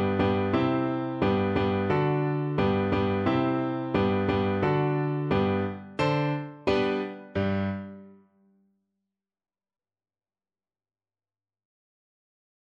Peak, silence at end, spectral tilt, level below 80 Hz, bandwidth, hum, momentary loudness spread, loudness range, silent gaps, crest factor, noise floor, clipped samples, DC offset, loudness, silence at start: -12 dBFS; 4.65 s; -8.5 dB/octave; -54 dBFS; 7.6 kHz; none; 5 LU; 9 LU; none; 16 dB; under -90 dBFS; under 0.1%; under 0.1%; -27 LUFS; 0 s